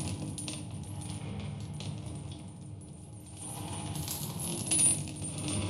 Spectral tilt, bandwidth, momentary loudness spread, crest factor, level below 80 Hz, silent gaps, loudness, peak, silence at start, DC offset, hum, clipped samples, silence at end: -3.5 dB/octave; 16 kHz; 21 LU; 24 dB; -56 dBFS; none; -33 LUFS; -12 dBFS; 0 s; under 0.1%; none; under 0.1%; 0 s